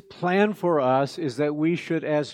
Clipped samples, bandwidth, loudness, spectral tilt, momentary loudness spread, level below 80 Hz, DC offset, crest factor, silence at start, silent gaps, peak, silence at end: under 0.1%; 14.5 kHz; -24 LUFS; -7 dB/octave; 5 LU; -74 dBFS; under 0.1%; 16 dB; 0.1 s; none; -6 dBFS; 0 s